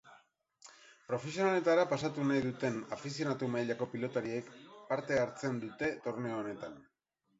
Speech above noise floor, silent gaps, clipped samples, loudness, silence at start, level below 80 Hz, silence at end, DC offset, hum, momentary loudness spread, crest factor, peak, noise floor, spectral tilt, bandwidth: 45 dB; none; under 0.1%; -35 LUFS; 0.05 s; -72 dBFS; 0.55 s; under 0.1%; none; 13 LU; 20 dB; -16 dBFS; -80 dBFS; -5 dB/octave; 7.6 kHz